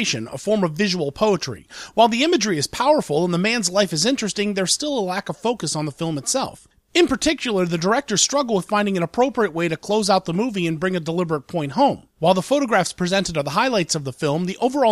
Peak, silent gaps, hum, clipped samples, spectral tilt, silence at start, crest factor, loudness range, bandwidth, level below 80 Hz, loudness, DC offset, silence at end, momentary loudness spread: -4 dBFS; none; none; under 0.1%; -4 dB/octave; 0 s; 18 dB; 2 LU; 14.5 kHz; -52 dBFS; -20 LUFS; under 0.1%; 0 s; 6 LU